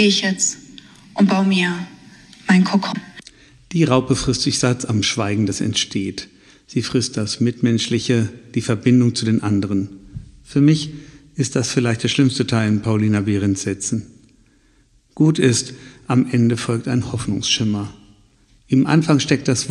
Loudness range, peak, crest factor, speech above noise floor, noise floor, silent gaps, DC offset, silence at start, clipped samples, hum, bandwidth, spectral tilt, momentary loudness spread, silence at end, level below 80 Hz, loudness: 2 LU; 0 dBFS; 18 dB; 38 dB; -56 dBFS; none; under 0.1%; 0 s; under 0.1%; none; 11.5 kHz; -5 dB/octave; 15 LU; 0 s; -48 dBFS; -18 LUFS